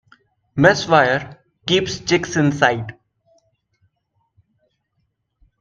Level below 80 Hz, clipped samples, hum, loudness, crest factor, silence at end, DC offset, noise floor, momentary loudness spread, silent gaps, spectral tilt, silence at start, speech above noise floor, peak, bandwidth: -54 dBFS; under 0.1%; none; -17 LUFS; 20 dB; 2.7 s; under 0.1%; -70 dBFS; 16 LU; none; -4.5 dB/octave; 0.55 s; 54 dB; 0 dBFS; 9.2 kHz